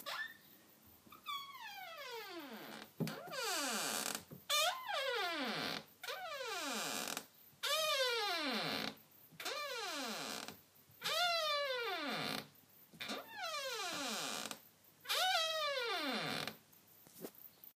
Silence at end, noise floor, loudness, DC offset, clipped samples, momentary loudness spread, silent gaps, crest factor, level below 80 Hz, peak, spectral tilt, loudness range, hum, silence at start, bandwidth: 0.05 s; -65 dBFS; -39 LUFS; under 0.1%; under 0.1%; 17 LU; none; 20 dB; -88 dBFS; -22 dBFS; -1.5 dB/octave; 4 LU; none; 0 s; 15.5 kHz